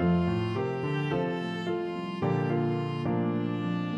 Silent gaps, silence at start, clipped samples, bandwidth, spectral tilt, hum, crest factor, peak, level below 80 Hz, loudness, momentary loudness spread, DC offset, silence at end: none; 0 s; under 0.1%; 7.8 kHz; -8.5 dB/octave; none; 14 dB; -16 dBFS; -56 dBFS; -30 LUFS; 4 LU; under 0.1%; 0 s